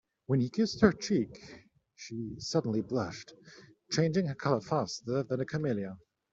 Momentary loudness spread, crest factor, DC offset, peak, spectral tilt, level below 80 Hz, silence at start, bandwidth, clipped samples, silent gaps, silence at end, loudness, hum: 18 LU; 24 dB; under 0.1%; -8 dBFS; -6 dB/octave; -64 dBFS; 0.3 s; 7.8 kHz; under 0.1%; none; 0.35 s; -32 LUFS; none